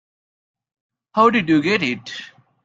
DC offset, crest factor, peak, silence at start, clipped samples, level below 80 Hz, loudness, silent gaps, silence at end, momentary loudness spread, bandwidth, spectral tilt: under 0.1%; 20 dB; -2 dBFS; 1.15 s; under 0.1%; -60 dBFS; -18 LUFS; none; 0.4 s; 16 LU; 7.8 kHz; -5.5 dB/octave